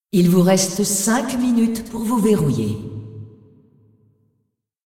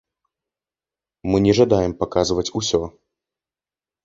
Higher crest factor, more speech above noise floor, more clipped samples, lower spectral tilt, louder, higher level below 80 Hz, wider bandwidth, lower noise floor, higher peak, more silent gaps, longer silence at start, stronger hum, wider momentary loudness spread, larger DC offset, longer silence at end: about the same, 16 dB vs 20 dB; second, 54 dB vs over 71 dB; neither; about the same, -5 dB/octave vs -5.5 dB/octave; about the same, -18 LUFS vs -19 LUFS; second, -50 dBFS vs -44 dBFS; first, 17 kHz vs 7.8 kHz; second, -71 dBFS vs under -90 dBFS; about the same, -4 dBFS vs -2 dBFS; neither; second, 0.15 s vs 1.25 s; neither; first, 18 LU vs 9 LU; neither; first, 1.55 s vs 1.15 s